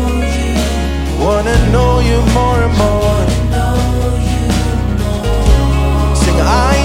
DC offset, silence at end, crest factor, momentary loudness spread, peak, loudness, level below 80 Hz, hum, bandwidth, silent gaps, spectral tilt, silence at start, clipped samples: under 0.1%; 0 s; 12 dB; 5 LU; 0 dBFS; -13 LUFS; -14 dBFS; none; 16 kHz; none; -6 dB/octave; 0 s; under 0.1%